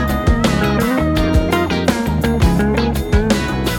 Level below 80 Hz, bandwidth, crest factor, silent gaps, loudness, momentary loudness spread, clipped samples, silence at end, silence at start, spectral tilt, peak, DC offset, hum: -22 dBFS; 19 kHz; 12 dB; none; -16 LUFS; 2 LU; under 0.1%; 0 s; 0 s; -6 dB/octave; -2 dBFS; under 0.1%; none